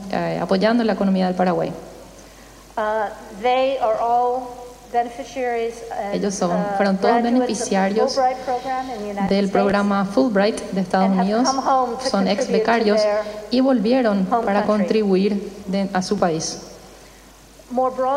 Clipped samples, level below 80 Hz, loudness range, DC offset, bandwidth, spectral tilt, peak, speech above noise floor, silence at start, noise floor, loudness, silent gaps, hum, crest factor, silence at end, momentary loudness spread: under 0.1%; -52 dBFS; 4 LU; under 0.1%; 13 kHz; -5.5 dB/octave; -4 dBFS; 26 dB; 0 s; -45 dBFS; -20 LUFS; none; none; 16 dB; 0 s; 9 LU